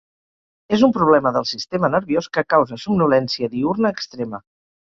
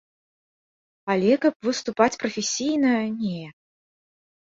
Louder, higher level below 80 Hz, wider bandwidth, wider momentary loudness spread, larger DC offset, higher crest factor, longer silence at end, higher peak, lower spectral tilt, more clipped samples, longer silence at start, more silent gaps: first, -19 LUFS vs -23 LUFS; first, -56 dBFS vs -66 dBFS; about the same, 7.6 kHz vs 7.8 kHz; about the same, 12 LU vs 11 LU; neither; about the same, 18 dB vs 22 dB; second, 0.5 s vs 1.05 s; about the same, -2 dBFS vs -4 dBFS; first, -6 dB/octave vs -4 dB/octave; neither; second, 0.7 s vs 1.05 s; second, none vs 1.55-1.60 s